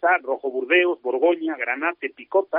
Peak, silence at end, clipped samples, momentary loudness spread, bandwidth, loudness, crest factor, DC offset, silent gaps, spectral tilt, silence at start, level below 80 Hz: -6 dBFS; 0 s; under 0.1%; 8 LU; 3.8 kHz; -22 LUFS; 16 dB; under 0.1%; none; 1 dB/octave; 0 s; -80 dBFS